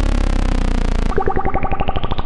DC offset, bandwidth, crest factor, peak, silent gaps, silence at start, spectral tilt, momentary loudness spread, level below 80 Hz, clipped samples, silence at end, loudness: under 0.1%; 10.5 kHz; 12 dB; -2 dBFS; none; 0 s; -6.5 dB/octave; 2 LU; -18 dBFS; under 0.1%; 0 s; -21 LUFS